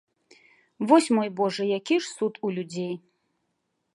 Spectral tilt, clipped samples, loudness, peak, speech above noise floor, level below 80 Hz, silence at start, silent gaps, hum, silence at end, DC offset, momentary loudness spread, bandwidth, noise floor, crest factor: -5 dB/octave; under 0.1%; -25 LUFS; -4 dBFS; 52 dB; -80 dBFS; 0.8 s; none; none; 0.95 s; under 0.1%; 13 LU; 11.5 kHz; -77 dBFS; 22 dB